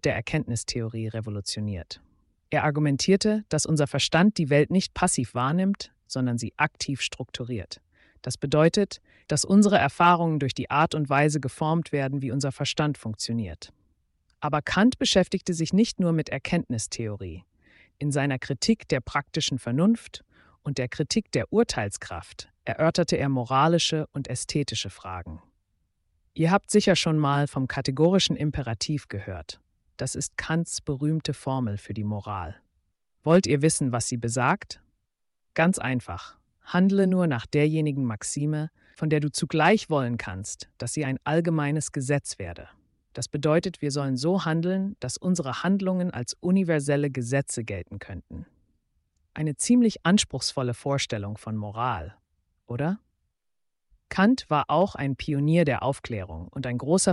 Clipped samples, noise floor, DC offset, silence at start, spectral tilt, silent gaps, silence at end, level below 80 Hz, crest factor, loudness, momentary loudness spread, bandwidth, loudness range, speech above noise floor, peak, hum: under 0.1%; -78 dBFS; under 0.1%; 0.05 s; -5 dB/octave; none; 0 s; -52 dBFS; 18 dB; -25 LUFS; 15 LU; 11.5 kHz; 5 LU; 53 dB; -8 dBFS; none